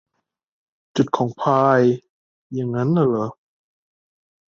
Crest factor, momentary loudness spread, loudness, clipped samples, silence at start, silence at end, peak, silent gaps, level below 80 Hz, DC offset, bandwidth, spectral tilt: 18 dB; 13 LU; -20 LUFS; under 0.1%; 0.95 s; 1.25 s; -4 dBFS; 2.09-2.50 s; -62 dBFS; under 0.1%; 7.6 kHz; -8 dB/octave